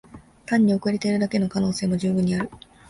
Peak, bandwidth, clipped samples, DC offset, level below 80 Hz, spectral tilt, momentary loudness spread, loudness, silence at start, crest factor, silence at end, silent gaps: -8 dBFS; 11.5 kHz; under 0.1%; under 0.1%; -52 dBFS; -6.5 dB/octave; 7 LU; -23 LUFS; 0.15 s; 14 dB; 0.3 s; none